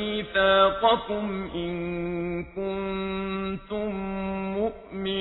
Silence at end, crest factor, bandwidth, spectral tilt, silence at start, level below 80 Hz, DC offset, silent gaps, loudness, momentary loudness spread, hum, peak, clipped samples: 0 s; 20 dB; 4.1 kHz; -8.5 dB/octave; 0 s; -48 dBFS; under 0.1%; none; -27 LUFS; 11 LU; none; -6 dBFS; under 0.1%